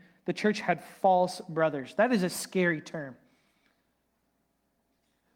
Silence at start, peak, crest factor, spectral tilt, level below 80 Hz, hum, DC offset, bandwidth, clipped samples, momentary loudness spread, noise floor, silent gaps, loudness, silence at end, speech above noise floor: 0.25 s; -12 dBFS; 20 dB; -5 dB/octave; -76 dBFS; none; under 0.1%; 18 kHz; under 0.1%; 11 LU; -75 dBFS; none; -28 LUFS; 2.2 s; 47 dB